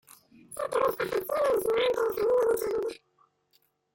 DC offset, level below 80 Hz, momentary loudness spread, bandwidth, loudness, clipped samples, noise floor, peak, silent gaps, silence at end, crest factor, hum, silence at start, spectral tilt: under 0.1%; -64 dBFS; 11 LU; 17 kHz; -28 LUFS; under 0.1%; -70 dBFS; -14 dBFS; none; 1 s; 14 dB; none; 0.5 s; -3.5 dB/octave